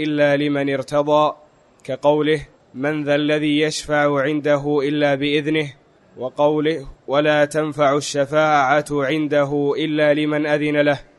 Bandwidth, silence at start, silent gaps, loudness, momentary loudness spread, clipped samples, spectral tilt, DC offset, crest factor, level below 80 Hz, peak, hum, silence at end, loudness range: 11.5 kHz; 0 s; none; -19 LUFS; 6 LU; under 0.1%; -5.5 dB/octave; under 0.1%; 16 dB; -52 dBFS; -2 dBFS; none; 0.15 s; 2 LU